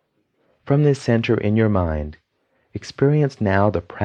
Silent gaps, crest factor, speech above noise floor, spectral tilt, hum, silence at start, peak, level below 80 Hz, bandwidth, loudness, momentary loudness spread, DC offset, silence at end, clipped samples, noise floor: none; 18 dB; 48 dB; -8 dB/octave; none; 0.65 s; -2 dBFS; -40 dBFS; 9 kHz; -19 LUFS; 16 LU; under 0.1%; 0 s; under 0.1%; -67 dBFS